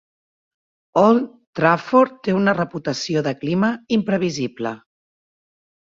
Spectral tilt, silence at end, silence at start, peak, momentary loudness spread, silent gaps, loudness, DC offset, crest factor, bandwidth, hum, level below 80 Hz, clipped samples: -6 dB/octave; 1.2 s; 0.95 s; -2 dBFS; 10 LU; 1.47-1.53 s; -20 LUFS; under 0.1%; 18 dB; 7.6 kHz; none; -62 dBFS; under 0.1%